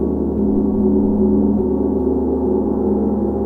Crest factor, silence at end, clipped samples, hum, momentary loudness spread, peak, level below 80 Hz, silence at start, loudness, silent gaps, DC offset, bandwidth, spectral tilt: 12 dB; 0 s; under 0.1%; none; 3 LU; -4 dBFS; -30 dBFS; 0 s; -17 LUFS; none; under 0.1%; 1.8 kHz; -13 dB/octave